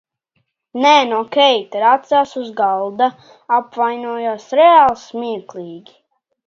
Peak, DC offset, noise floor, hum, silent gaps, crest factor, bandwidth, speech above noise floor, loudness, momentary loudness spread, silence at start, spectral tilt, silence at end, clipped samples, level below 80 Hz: 0 dBFS; under 0.1%; -68 dBFS; none; none; 16 dB; 7.4 kHz; 53 dB; -15 LUFS; 14 LU; 0.75 s; -3.5 dB/octave; 0.7 s; under 0.1%; -62 dBFS